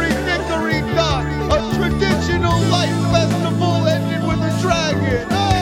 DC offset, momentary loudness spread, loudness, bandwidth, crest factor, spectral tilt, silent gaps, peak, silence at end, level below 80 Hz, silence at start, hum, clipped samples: under 0.1%; 3 LU; -18 LUFS; 15.5 kHz; 14 dB; -5.5 dB/octave; none; -2 dBFS; 0 s; -30 dBFS; 0 s; none; under 0.1%